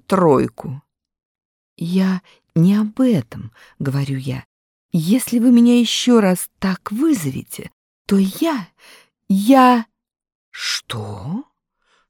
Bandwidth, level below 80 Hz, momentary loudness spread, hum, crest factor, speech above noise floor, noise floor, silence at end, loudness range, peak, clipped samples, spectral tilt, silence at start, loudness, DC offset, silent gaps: 18 kHz; -56 dBFS; 19 LU; none; 16 dB; 48 dB; -64 dBFS; 0.7 s; 4 LU; -2 dBFS; under 0.1%; -6 dB/octave; 0.1 s; -17 LUFS; under 0.1%; 1.25-1.35 s, 1.45-1.76 s, 4.45-4.89 s, 7.73-8.05 s, 10.35-10.52 s